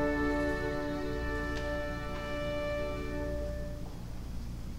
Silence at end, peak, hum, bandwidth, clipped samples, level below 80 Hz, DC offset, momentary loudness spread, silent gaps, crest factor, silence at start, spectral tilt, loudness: 0 s; -18 dBFS; none; 16 kHz; under 0.1%; -40 dBFS; under 0.1%; 11 LU; none; 16 dB; 0 s; -6.5 dB/octave; -36 LUFS